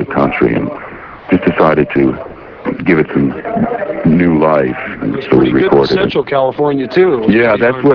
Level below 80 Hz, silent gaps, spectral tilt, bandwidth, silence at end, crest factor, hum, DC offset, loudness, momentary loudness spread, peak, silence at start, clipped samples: -40 dBFS; none; -9 dB/octave; 5.4 kHz; 0 s; 12 dB; none; under 0.1%; -12 LUFS; 11 LU; 0 dBFS; 0 s; 0.2%